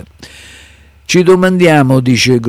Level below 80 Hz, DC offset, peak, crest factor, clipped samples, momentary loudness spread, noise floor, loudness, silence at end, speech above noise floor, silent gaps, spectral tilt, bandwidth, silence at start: -42 dBFS; under 0.1%; 0 dBFS; 10 dB; under 0.1%; 3 LU; -41 dBFS; -9 LUFS; 0 s; 32 dB; none; -5.5 dB/octave; 15 kHz; 0.2 s